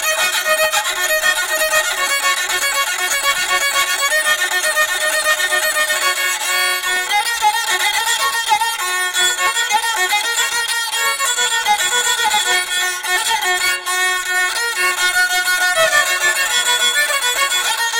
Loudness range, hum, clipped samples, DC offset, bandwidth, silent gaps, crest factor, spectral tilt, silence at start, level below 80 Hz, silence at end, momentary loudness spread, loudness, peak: 1 LU; none; under 0.1%; under 0.1%; 17 kHz; none; 14 dB; 2 dB/octave; 0 s; -54 dBFS; 0 s; 2 LU; -15 LUFS; -2 dBFS